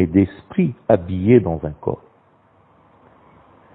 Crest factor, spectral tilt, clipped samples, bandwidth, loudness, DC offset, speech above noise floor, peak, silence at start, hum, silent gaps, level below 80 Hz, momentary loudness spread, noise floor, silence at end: 20 dB; -12.5 dB/octave; under 0.1%; 4 kHz; -19 LUFS; under 0.1%; 37 dB; 0 dBFS; 0 s; none; none; -46 dBFS; 12 LU; -55 dBFS; 1.8 s